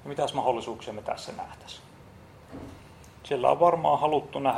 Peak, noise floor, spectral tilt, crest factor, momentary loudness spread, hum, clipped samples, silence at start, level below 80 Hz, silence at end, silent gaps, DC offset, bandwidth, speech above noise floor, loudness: -6 dBFS; -50 dBFS; -5.5 dB/octave; 22 dB; 23 LU; none; under 0.1%; 0.05 s; -60 dBFS; 0 s; none; under 0.1%; 16 kHz; 23 dB; -26 LUFS